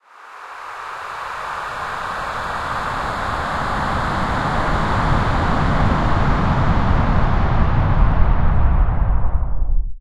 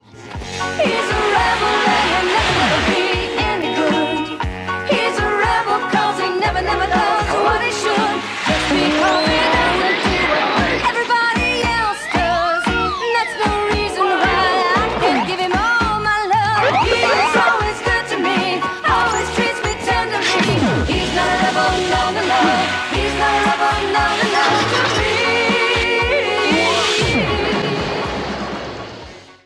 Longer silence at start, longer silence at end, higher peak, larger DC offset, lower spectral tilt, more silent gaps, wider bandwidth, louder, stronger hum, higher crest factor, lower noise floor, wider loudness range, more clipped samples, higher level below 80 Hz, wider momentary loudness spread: about the same, 0.15 s vs 0.15 s; second, 0 s vs 0.15 s; first, 0 dBFS vs -4 dBFS; neither; first, -7 dB/octave vs -4 dB/octave; neither; second, 10.5 kHz vs 14.5 kHz; second, -20 LUFS vs -16 LUFS; neither; about the same, 16 dB vs 12 dB; about the same, -39 dBFS vs -37 dBFS; first, 6 LU vs 2 LU; neither; first, -20 dBFS vs -34 dBFS; first, 10 LU vs 5 LU